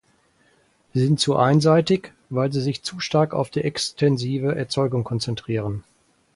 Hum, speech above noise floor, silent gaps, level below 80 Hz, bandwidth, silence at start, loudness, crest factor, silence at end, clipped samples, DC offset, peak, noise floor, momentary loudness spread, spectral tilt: none; 40 dB; none; -56 dBFS; 11.5 kHz; 0.95 s; -22 LUFS; 18 dB; 0.55 s; under 0.1%; under 0.1%; -4 dBFS; -61 dBFS; 9 LU; -6 dB/octave